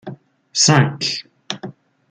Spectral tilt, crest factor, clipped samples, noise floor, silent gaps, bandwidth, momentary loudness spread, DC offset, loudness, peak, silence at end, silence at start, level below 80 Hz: -3.5 dB/octave; 20 dB; under 0.1%; -37 dBFS; none; 9.4 kHz; 20 LU; under 0.1%; -16 LUFS; -2 dBFS; 0.4 s; 0.05 s; -60 dBFS